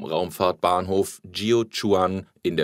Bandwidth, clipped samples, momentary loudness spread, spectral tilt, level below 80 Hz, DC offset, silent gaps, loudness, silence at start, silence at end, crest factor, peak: 16 kHz; under 0.1%; 7 LU; -5 dB/octave; -60 dBFS; under 0.1%; none; -24 LUFS; 0 s; 0 s; 18 dB; -6 dBFS